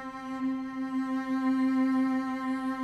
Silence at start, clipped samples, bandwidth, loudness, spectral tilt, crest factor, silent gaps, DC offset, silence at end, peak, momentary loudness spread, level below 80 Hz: 0 s; under 0.1%; 9.8 kHz; -30 LUFS; -5.5 dB/octave; 10 dB; none; under 0.1%; 0 s; -18 dBFS; 7 LU; -66 dBFS